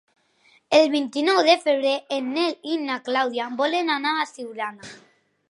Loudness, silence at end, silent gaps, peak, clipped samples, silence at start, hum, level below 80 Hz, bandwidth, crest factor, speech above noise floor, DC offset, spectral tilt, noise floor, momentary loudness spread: -22 LUFS; 0.55 s; none; -2 dBFS; under 0.1%; 0.7 s; none; -78 dBFS; 11.5 kHz; 20 dB; 38 dB; under 0.1%; -2.5 dB/octave; -60 dBFS; 13 LU